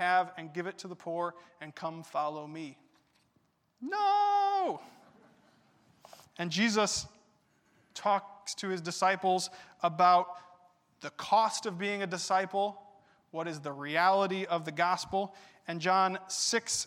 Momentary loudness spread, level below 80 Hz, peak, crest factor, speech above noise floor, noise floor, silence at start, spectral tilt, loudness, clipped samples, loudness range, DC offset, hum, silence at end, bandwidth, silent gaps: 17 LU; -74 dBFS; -14 dBFS; 20 dB; 42 dB; -73 dBFS; 0 s; -3 dB/octave; -31 LUFS; under 0.1%; 5 LU; under 0.1%; none; 0 s; 15.5 kHz; none